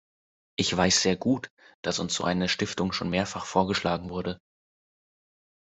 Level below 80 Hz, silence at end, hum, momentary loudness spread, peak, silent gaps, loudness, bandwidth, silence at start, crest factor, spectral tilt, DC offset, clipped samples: -62 dBFS; 1.3 s; none; 13 LU; -8 dBFS; 1.50-1.57 s, 1.74-1.83 s; -27 LUFS; 8.2 kHz; 0.6 s; 22 dB; -3.5 dB/octave; under 0.1%; under 0.1%